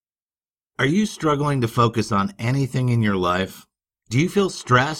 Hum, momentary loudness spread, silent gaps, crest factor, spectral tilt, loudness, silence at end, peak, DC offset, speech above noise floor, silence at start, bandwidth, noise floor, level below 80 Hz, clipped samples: none; 5 LU; none; 18 dB; -6 dB/octave; -21 LUFS; 0 s; -2 dBFS; under 0.1%; over 70 dB; 0.8 s; 15.5 kHz; under -90 dBFS; -52 dBFS; under 0.1%